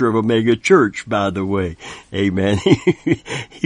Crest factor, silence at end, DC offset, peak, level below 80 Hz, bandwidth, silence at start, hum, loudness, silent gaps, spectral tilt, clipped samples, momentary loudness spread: 18 dB; 0 s; under 0.1%; 0 dBFS; -46 dBFS; 10.5 kHz; 0 s; none; -17 LUFS; none; -6 dB/octave; under 0.1%; 12 LU